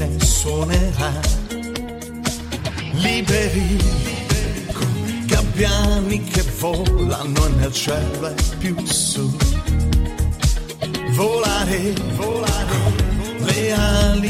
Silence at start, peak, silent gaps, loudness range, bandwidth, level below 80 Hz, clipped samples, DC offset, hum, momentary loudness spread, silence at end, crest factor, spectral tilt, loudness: 0 s; -2 dBFS; none; 2 LU; 16.5 kHz; -24 dBFS; under 0.1%; under 0.1%; none; 8 LU; 0 s; 16 dB; -4.5 dB/octave; -20 LUFS